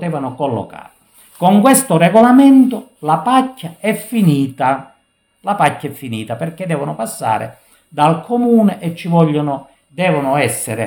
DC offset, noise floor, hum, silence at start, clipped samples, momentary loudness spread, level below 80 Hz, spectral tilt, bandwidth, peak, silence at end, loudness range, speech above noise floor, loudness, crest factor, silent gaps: under 0.1%; -59 dBFS; none; 0 s; under 0.1%; 15 LU; -60 dBFS; -6 dB/octave; over 20 kHz; 0 dBFS; 0 s; 7 LU; 46 dB; -14 LUFS; 14 dB; none